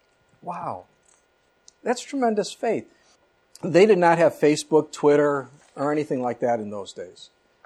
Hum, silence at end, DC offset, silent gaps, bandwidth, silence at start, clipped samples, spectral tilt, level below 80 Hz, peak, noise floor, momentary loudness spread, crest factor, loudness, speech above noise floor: none; 0.55 s; under 0.1%; none; 12.5 kHz; 0.45 s; under 0.1%; -5.5 dB/octave; -70 dBFS; -4 dBFS; -64 dBFS; 19 LU; 20 dB; -22 LUFS; 43 dB